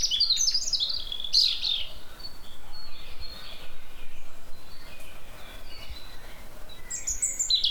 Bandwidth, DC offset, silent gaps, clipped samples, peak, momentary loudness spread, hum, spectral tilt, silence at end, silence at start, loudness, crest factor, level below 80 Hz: 19 kHz; under 0.1%; none; under 0.1%; -10 dBFS; 26 LU; none; 1 dB/octave; 0 s; 0 s; -24 LUFS; 18 dB; -42 dBFS